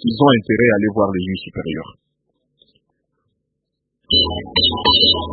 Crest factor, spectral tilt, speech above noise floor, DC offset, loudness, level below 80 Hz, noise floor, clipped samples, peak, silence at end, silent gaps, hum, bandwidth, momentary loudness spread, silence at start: 18 dB; -10.5 dB/octave; 60 dB; under 0.1%; -15 LUFS; -42 dBFS; -76 dBFS; under 0.1%; 0 dBFS; 0 s; none; none; 4.8 kHz; 14 LU; 0.05 s